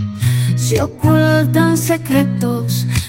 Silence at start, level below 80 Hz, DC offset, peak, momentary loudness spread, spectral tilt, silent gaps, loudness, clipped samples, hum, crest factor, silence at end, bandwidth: 0 s; -40 dBFS; under 0.1%; 0 dBFS; 5 LU; -6 dB/octave; none; -15 LUFS; under 0.1%; none; 14 dB; 0 s; 17 kHz